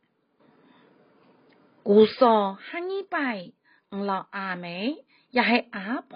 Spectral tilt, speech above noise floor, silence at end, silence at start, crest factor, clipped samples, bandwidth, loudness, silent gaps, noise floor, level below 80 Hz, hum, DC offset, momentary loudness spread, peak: -3.5 dB/octave; 40 dB; 0 s; 1.85 s; 20 dB; under 0.1%; 5.2 kHz; -25 LUFS; none; -64 dBFS; -78 dBFS; none; under 0.1%; 15 LU; -6 dBFS